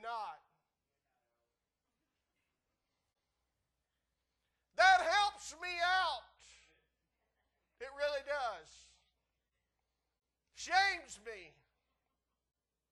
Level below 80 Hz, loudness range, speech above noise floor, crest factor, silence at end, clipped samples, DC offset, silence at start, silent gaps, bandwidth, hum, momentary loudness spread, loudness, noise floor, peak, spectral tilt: -72 dBFS; 11 LU; 51 dB; 24 dB; 1.45 s; under 0.1%; under 0.1%; 0.05 s; none; 12 kHz; none; 22 LU; -33 LUFS; -89 dBFS; -16 dBFS; 0 dB/octave